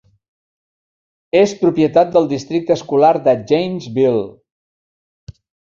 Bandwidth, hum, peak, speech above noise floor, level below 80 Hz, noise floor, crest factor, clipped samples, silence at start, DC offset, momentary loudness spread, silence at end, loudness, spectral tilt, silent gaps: 7.4 kHz; none; 0 dBFS; over 76 dB; -56 dBFS; under -90 dBFS; 16 dB; under 0.1%; 1.35 s; under 0.1%; 8 LU; 0.45 s; -15 LUFS; -6.5 dB/octave; 4.52-5.27 s